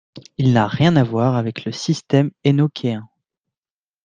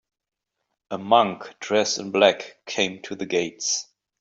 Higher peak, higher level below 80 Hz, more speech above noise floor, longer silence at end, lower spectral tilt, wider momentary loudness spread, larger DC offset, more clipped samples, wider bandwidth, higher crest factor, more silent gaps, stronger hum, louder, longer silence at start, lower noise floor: about the same, -2 dBFS vs -2 dBFS; first, -52 dBFS vs -70 dBFS; first, over 73 dB vs 57 dB; first, 1 s vs 0.35 s; first, -7 dB/octave vs -2.5 dB/octave; second, 10 LU vs 14 LU; neither; neither; about the same, 8.6 kHz vs 8 kHz; second, 16 dB vs 22 dB; neither; neither; first, -18 LUFS vs -23 LUFS; second, 0.15 s vs 0.9 s; first, under -90 dBFS vs -80 dBFS